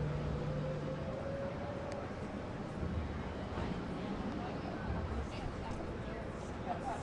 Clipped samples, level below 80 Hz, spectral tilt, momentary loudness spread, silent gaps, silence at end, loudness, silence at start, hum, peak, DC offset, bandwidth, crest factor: under 0.1%; -48 dBFS; -7.5 dB/octave; 4 LU; none; 0 s; -41 LUFS; 0 s; none; -26 dBFS; under 0.1%; 11 kHz; 14 dB